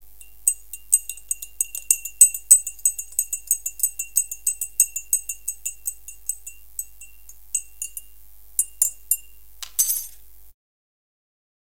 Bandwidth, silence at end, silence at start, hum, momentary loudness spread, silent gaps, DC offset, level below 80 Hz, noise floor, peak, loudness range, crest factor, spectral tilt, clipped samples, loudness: 17.5 kHz; 1.2 s; 0.45 s; none; 18 LU; none; 0.8%; -56 dBFS; -51 dBFS; 0 dBFS; 10 LU; 26 dB; 3.5 dB/octave; under 0.1%; -21 LUFS